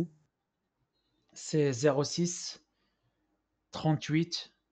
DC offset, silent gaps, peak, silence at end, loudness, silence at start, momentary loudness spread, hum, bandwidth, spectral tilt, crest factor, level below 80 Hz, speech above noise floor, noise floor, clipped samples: under 0.1%; none; -14 dBFS; 0.25 s; -31 LUFS; 0 s; 15 LU; none; 9 kHz; -5 dB/octave; 20 dB; -72 dBFS; 53 dB; -84 dBFS; under 0.1%